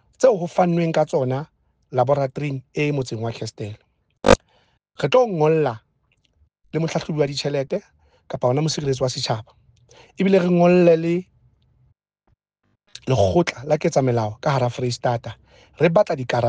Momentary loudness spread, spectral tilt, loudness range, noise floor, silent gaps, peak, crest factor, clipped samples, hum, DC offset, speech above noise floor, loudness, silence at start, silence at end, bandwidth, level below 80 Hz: 12 LU; -6 dB/octave; 4 LU; -71 dBFS; none; -2 dBFS; 18 dB; under 0.1%; none; under 0.1%; 51 dB; -21 LUFS; 0.2 s; 0 s; 9.6 kHz; -48 dBFS